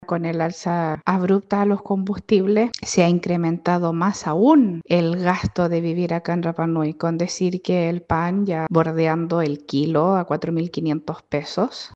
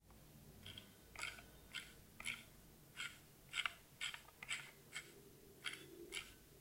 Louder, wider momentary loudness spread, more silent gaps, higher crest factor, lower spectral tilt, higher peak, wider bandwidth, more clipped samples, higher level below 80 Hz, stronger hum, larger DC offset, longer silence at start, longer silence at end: first, -21 LUFS vs -50 LUFS; second, 6 LU vs 16 LU; neither; second, 18 dB vs 30 dB; first, -6.5 dB/octave vs -1 dB/octave; first, -2 dBFS vs -24 dBFS; second, 8.2 kHz vs 16.5 kHz; neither; first, -52 dBFS vs -72 dBFS; neither; neither; about the same, 0 s vs 0 s; about the same, 0.1 s vs 0 s